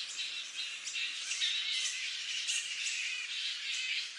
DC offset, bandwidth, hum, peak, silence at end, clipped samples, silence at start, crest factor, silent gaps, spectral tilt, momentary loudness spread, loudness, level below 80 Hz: under 0.1%; 11.5 kHz; none; -20 dBFS; 0 s; under 0.1%; 0 s; 16 dB; none; 5.5 dB/octave; 6 LU; -34 LUFS; under -90 dBFS